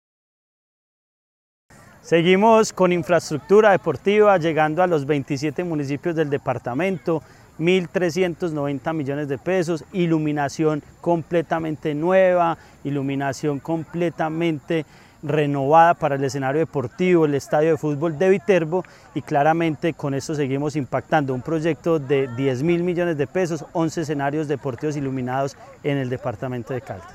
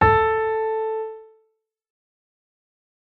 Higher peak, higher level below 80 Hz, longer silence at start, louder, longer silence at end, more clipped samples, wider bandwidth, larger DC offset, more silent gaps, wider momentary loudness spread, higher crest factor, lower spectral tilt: about the same, -2 dBFS vs -4 dBFS; second, -58 dBFS vs -42 dBFS; first, 2.05 s vs 0 s; about the same, -21 LUFS vs -22 LUFS; second, 0 s vs 1.75 s; neither; first, 14 kHz vs 4.8 kHz; neither; neither; second, 10 LU vs 16 LU; about the same, 18 dB vs 20 dB; second, -6.5 dB/octave vs -8 dB/octave